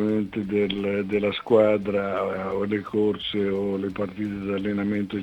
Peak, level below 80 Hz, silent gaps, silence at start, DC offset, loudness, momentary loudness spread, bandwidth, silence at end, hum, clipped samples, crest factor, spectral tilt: -8 dBFS; -56 dBFS; none; 0 s; under 0.1%; -25 LUFS; 8 LU; 18.5 kHz; 0 s; none; under 0.1%; 18 dB; -8 dB/octave